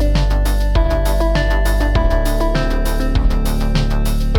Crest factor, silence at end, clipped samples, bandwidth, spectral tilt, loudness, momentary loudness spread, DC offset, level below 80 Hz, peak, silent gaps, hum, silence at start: 10 dB; 0 s; under 0.1%; 17 kHz; -6 dB/octave; -18 LUFS; 3 LU; under 0.1%; -16 dBFS; -4 dBFS; none; none; 0 s